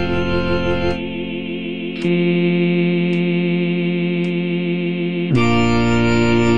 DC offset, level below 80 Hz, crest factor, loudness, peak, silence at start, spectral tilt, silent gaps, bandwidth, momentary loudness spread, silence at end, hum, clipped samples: under 0.1%; -38 dBFS; 14 dB; -18 LUFS; -4 dBFS; 0 s; -7 dB/octave; none; 7.4 kHz; 9 LU; 0 s; none; under 0.1%